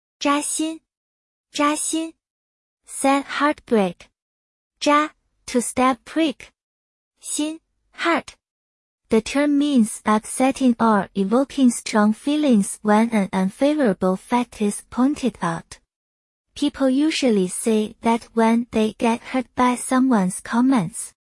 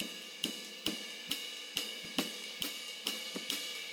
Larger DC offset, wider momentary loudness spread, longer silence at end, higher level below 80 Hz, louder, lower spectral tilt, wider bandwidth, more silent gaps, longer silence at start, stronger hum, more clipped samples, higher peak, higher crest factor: neither; first, 8 LU vs 2 LU; first, 0.15 s vs 0 s; first, -56 dBFS vs -76 dBFS; first, -20 LUFS vs -38 LUFS; first, -4.5 dB/octave vs -1 dB/octave; second, 12 kHz vs over 20 kHz; first, 0.97-1.44 s, 2.30-2.77 s, 4.22-4.71 s, 6.63-7.11 s, 8.51-8.98 s, 15.96-16.44 s vs none; first, 0.2 s vs 0 s; neither; neither; first, -6 dBFS vs -16 dBFS; second, 16 dB vs 24 dB